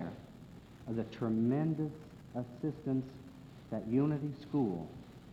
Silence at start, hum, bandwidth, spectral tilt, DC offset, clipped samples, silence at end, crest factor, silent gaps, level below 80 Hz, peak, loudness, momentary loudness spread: 0 s; none; 8.8 kHz; -9.5 dB/octave; under 0.1%; under 0.1%; 0 s; 16 dB; none; -64 dBFS; -20 dBFS; -36 LUFS; 20 LU